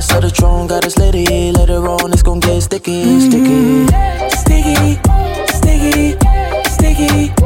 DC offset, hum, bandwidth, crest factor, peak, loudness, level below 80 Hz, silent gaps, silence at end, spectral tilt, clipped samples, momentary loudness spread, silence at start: under 0.1%; none; 17 kHz; 10 dB; 0 dBFS; -12 LUFS; -14 dBFS; none; 0 s; -5.5 dB/octave; under 0.1%; 5 LU; 0 s